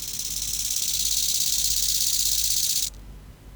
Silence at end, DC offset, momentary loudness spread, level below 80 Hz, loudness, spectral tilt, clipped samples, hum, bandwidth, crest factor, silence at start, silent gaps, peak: 0 s; under 0.1%; 6 LU; -44 dBFS; -21 LUFS; 1.5 dB/octave; under 0.1%; none; over 20 kHz; 18 dB; 0 s; none; -8 dBFS